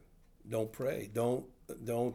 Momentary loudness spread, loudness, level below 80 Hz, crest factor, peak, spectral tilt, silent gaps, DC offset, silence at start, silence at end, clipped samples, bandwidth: 9 LU; -37 LUFS; -64 dBFS; 16 dB; -22 dBFS; -6.5 dB/octave; none; under 0.1%; 0.45 s; 0 s; under 0.1%; 20 kHz